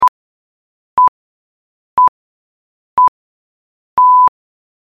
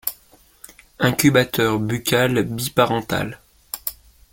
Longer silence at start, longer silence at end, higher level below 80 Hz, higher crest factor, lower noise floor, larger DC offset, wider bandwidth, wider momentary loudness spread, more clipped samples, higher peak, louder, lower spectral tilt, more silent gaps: about the same, 0 s vs 0.05 s; first, 0.65 s vs 0.4 s; second, -56 dBFS vs -50 dBFS; second, 12 dB vs 22 dB; first, under -90 dBFS vs -53 dBFS; neither; second, 4.9 kHz vs 17 kHz; about the same, 11 LU vs 12 LU; neither; second, -4 dBFS vs 0 dBFS; first, -13 LUFS vs -20 LUFS; about the same, -4.5 dB/octave vs -4.5 dB/octave; first, 0.09-0.97 s, 1.08-1.97 s, 2.08-2.97 s, 3.08-3.97 s vs none